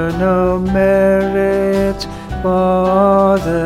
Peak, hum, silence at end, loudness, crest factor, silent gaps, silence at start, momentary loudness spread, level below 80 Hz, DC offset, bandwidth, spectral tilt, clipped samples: -2 dBFS; none; 0 s; -14 LUFS; 12 dB; none; 0 s; 7 LU; -32 dBFS; 0.2%; 14.5 kHz; -7.5 dB/octave; under 0.1%